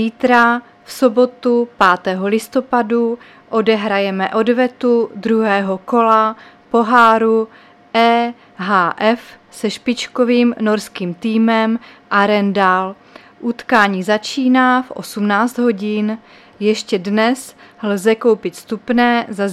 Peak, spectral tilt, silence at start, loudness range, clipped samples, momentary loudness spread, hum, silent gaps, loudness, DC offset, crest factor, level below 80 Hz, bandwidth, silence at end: 0 dBFS; -5.5 dB/octave; 0 s; 3 LU; under 0.1%; 11 LU; none; none; -15 LUFS; under 0.1%; 16 dB; -62 dBFS; 14 kHz; 0 s